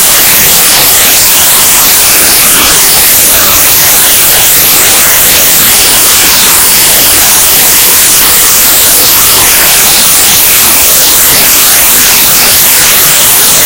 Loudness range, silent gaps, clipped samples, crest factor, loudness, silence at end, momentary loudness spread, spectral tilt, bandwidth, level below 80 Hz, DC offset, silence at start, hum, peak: 0 LU; none; 20%; 4 dB; 0 LUFS; 0 s; 0 LU; 0.5 dB/octave; over 20 kHz; -28 dBFS; under 0.1%; 0 s; none; 0 dBFS